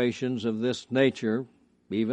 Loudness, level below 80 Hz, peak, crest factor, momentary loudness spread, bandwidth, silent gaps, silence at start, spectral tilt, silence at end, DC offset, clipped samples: -28 LUFS; -70 dBFS; -10 dBFS; 18 dB; 8 LU; 9.4 kHz; none; 0 s; -6 dB/octave; 0 s; under 0.1%; under 0.1%